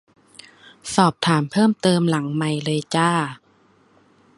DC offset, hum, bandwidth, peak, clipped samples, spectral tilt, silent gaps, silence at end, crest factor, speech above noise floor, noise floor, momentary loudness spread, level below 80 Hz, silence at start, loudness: under 0.1%; none; 11.5 kHz; 0 dBFS; under 0.1%; -5.5 dB/octave; none; 1 s; 20 dB; 38 dB; -57 dBFS; 6 LU; -62 dBFS; 0.85 s; -20 LUFS